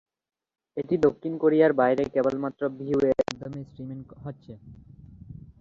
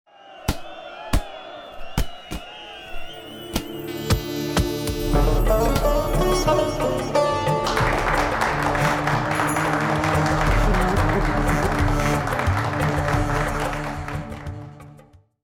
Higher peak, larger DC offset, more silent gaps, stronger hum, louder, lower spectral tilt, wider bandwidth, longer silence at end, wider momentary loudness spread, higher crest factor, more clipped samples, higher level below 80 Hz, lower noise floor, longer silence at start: about the same, -8 dBFS vs -8 dBFS; neither; neither; neither; second, -25 LUFS vs -22 LUFS; first, -7 dB/octave vs -5.5 dB/octave; second, 7.6 kHz vs 19.5 kHz; second, 0.1 s vs 0.4 s; first, 23 LU vs 16 LU; first, 20 dB vs 14 dB; neither; second, -58 dBFS vs -28 dBFS; second, -45 dBFS vs -50 dBFS; first, 0.75 s vs 0.25 s